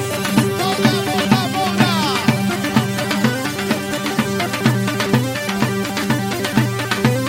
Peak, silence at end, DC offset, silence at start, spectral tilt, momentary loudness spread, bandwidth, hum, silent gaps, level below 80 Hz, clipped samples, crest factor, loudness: -2 dBFS; 0 s; under 0.1%; 0 s; -5 dB/octave; 4 LU; 16.5 kHz; none; none; -50 dBFS; under 0.1%; 16 dB; -18 LUFS